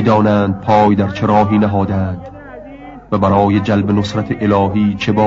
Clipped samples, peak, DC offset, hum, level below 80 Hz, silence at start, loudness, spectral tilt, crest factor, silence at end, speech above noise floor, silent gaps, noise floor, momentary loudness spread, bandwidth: under 0.1%; -2 dBFS; under 0.1%; none; -42 dBFS; 0 s; -14 LUFS; -8 dB/octave; 12 dB; 0 s; 20 dB; none; -33 dBFS; 21 LU; 7.6 kHz